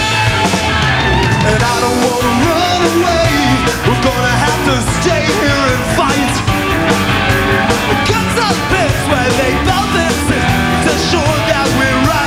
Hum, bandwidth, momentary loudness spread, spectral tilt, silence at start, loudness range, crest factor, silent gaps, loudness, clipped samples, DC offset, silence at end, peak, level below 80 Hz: none; 16.5 kHz; 2 LU; -4.5 dB/octave; 0 s; 1 LU; 12 dB; none; -12 LUFS; under 0.1%; under 0.1%; 0 s; 0 dBFS; -26 dBFS